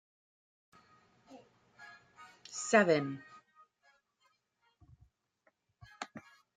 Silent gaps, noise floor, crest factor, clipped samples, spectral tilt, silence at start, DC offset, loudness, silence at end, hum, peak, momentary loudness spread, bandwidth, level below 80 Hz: none; -77 dBFS; 26 dB; under 0.1%; -4 dB/octave; 1.3 s; under 0.1%; -31 LUFS; 0.35 s; none; -12 dBFS; 28 LU; 9.6 kHz; -78 dBFS